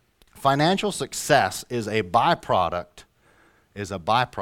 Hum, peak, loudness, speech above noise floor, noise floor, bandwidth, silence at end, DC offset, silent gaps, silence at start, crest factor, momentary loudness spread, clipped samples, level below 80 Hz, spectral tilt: none; -2 dBFS; -23 LUFS; 36 dB; -59 dBFS; 17 kHz; 0 s; under 0.1%; none; 0.35 s; 22 dB; 12 LU; under 0.1%; -54 dBFS; -4 dB/octave